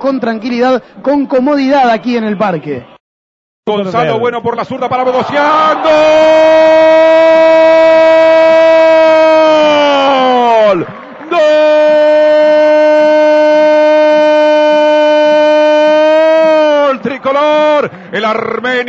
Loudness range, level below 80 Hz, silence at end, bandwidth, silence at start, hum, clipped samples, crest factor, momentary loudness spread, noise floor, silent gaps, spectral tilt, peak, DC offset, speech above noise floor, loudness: 7 LU; -52 dBFS; 0 s; 7.6 kHz; 0 s; none; under 0.1%; 8 dB; 9 LU; under -90 dBFS; 3.00-3.63 s; -5 dB/octave; 0 dBFS; under 0.1%; over 81 dB; -8 LUFS